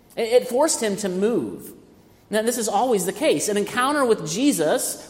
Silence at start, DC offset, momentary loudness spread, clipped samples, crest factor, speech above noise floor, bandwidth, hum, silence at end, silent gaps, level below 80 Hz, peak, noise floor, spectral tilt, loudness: 0.15 s; under 0.1%; 6 LU; under 0.1%; 16 dB; 30 dB; 16.5 kHz; none; 0 s; none; -62 dBFS; -6 dBFS; -51 dBFS; -3.5 dB/octave; -21 LUFS